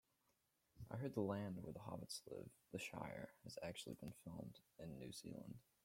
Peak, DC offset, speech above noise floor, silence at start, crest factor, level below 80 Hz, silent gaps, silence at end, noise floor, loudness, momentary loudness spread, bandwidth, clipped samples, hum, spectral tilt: -30 dBFS; under 0.1%; 33 dB; 0.75 s; 22 dB; -76 dBFS; none; 0.25 s; -85 dBFS; -52 LUFS; 11 LU; 16.5 kHz; under 0.1%; none; -5.5 dB/octave